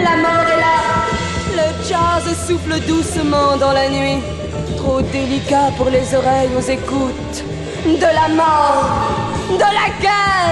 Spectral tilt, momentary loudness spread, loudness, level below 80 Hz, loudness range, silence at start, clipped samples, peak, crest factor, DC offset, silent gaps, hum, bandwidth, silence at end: -5 dB/octave; 7 LU; -15 LUFS; -32 dBFS; 2 LU; 0 s; under 0.1%; -2 dBFS; 12 dB; under 0.1%; none; none; 12 kHz; 0 s